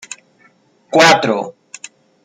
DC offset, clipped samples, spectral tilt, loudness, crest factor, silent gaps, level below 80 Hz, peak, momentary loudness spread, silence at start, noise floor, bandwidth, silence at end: under 0.1%; under 0.1%; -3 dB/octave; -12 LUFS; 18 dB; none; -64 dBFS; 0 dBFS; 25 LU; 0.1 s; -53 dBFS; 16 kHz; 0.75 s